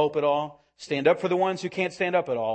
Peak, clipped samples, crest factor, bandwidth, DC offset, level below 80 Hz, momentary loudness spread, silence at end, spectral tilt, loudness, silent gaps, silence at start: -8 dBFS; under 0.1%; 18 dB; 8.8 kHz; under 0.1%; -70 dBFS; 8 LU; 0 s; -5.5 dB/octave; -25 LUFS; none; 0 s